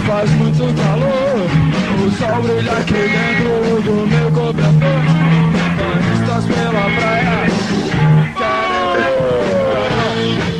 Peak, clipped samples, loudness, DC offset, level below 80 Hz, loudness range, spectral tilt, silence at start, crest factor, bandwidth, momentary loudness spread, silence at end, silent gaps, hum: -2 dBFS; under 0.1%; -14 LUFS; under 0.1%; -36 dBFS; 1 LU; -7 dB/octave; 0 s; 12 dB; 9.8 kHz; 3 LU; 0 s; none; none